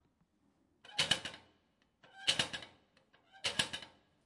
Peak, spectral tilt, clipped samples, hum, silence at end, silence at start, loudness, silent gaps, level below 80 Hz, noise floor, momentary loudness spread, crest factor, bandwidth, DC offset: -14 dBFS; -1 dB/octave; under 0.1%; none; 0.35 s; 0.85 s; -36 LUFS; none; -74 dBFS; -75 dBFS; 21 LU; 28 dB; 11.5 kHz; under 0.1%